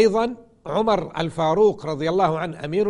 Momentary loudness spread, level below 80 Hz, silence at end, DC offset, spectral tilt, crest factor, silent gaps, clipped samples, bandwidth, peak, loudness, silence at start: 9 LU; -50 dBFS; 0 s; under 0.1%; -6.5 dB/octave; 14 dB; none; under 0.1%; 11 kHz; -6 dBFS; -22 LUFS; 0 s